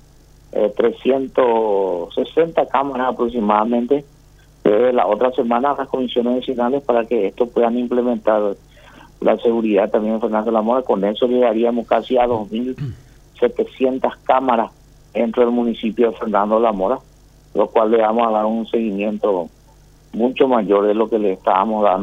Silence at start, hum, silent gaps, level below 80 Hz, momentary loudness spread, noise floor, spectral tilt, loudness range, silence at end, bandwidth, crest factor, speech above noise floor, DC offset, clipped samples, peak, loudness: 0.55 s; 50 Hz at -50 dBFS; none; -50 dBFS; 6 LU; -47 dBFS; -7.5 dB/octave; 2 LU; 0 s; 7.6 kHz; 18 dB; 30 dB; under 0.1%; under 0.1%; 0 dBFS; -18 LUFS